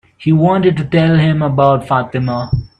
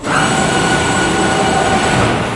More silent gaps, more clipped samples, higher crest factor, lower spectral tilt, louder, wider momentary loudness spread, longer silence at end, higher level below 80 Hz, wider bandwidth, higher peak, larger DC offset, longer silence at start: neither; neither; about the same, 12 dB vs 12 dB; first, -9 dB/octave vs -4 dB/octave; about the same, -13 LUFS vs -13 LUFS; first, 7 LU vs 1 LU; first, 0.15 s vs 0 s; about the same, -38 dBFS vs -34 dBFS; second, 5.8 kHz vs 11.5 kHz; about the same, 0 dBFS vs 0 dBFS; neither; first, 0.2 s vs 0 s